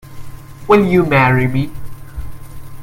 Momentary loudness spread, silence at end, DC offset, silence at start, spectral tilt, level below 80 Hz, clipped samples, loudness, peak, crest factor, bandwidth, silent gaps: 22 LU; 0 s; under 0.1%; 0.05 s; -8 dB/octave; -34 dBFS; under 0.1%; -13 LUFS; 0 dBFS; 16 dB; 16.5 kHz; none